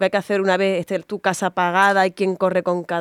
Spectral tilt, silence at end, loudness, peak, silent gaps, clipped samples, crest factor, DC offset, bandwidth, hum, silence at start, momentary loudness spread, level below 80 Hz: -5 dB/octave; 0 s; -19 LUFS; -4 dBFS; none; under 0.1%; 16 dB; under 0.1%; 15 kHz; none; 0 s; 7 LU; -70 dBFS